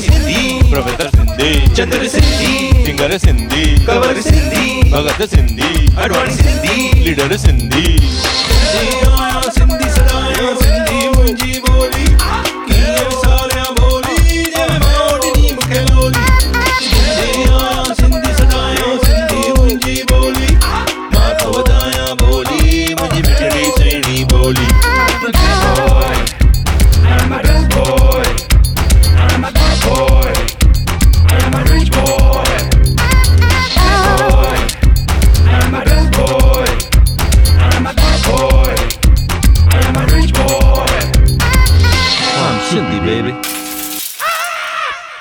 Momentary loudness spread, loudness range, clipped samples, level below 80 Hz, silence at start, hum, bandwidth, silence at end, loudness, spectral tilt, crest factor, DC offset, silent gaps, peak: 4 LU; 2 LU; under 0.1%; -12 dBFS; 0 s; none; 19 kHz; 0 s; -12 LUFS; -4.5 dB/octave; 10 dB; under 0.1%; none; 0 dBFS